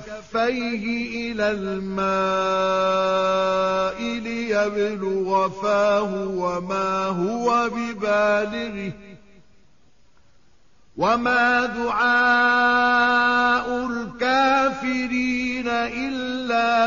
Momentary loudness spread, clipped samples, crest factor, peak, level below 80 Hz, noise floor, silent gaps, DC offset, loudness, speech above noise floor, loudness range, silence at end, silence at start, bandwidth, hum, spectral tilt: 9 LU; under 0.1%; 14 dB; -8 dBFS; -54 dBFS; -60 dBFS; none; 0.3%; -21 LUFS; 39 dB; 6 LU; 0 s; 0 s; 7.2 kHz; none; -2.5 dB/octave